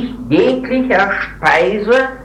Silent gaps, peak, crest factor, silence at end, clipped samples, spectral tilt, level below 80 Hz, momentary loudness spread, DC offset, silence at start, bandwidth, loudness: none; 0 dBFS; 14 dB; 0 s; under 0.1%; -6 dB/octave; -40 dBFS; 4 LU; under 0.1%; 0 s; 10.5 kHz; -14 LUFS